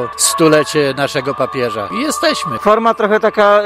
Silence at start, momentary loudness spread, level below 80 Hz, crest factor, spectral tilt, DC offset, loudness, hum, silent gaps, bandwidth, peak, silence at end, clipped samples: 0 s; 7 LU; -50 dBFS; 14 dB; -3.5 dB/octave; under 0.1%; -14 LUFS; none; none; 16 kHz; 0 dBFS; 0 s; under 0.1%